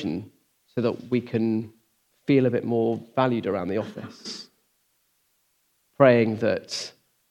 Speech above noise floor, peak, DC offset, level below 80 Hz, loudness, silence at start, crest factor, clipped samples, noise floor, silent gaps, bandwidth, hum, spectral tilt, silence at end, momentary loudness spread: 46 dB; -2 dBFS; under 0.1%; -72 dBFS; -24 LUFS; 0 s; 24 dB; under 0.1%; -70 dBFS; none; 12 kHz; none; -6.5 dB/octave; 0.4 s; 17 LU